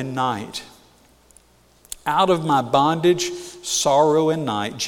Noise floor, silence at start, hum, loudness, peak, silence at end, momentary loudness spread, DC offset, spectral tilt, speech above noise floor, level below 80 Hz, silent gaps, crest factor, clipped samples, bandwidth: -55 dBFS; 0 s; none; -20 LUFS; -4 dBFS; 0 s; 14 LU; under 0.1%; -4 dB/octave; 35 dB; -56 dBFS; none; 18 dB; under 0.1%; 17.5 kHz